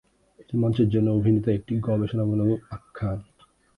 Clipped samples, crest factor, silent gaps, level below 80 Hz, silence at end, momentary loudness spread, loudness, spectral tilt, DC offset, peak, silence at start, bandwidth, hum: under 0.1%; 14 dB; none; -48 dBFS; 0.55 s; 10 LU; -25 LUFS; -10.5 dB/octave; under 0.1%; -10 dBFS; 0.4 s; 5 kHz; none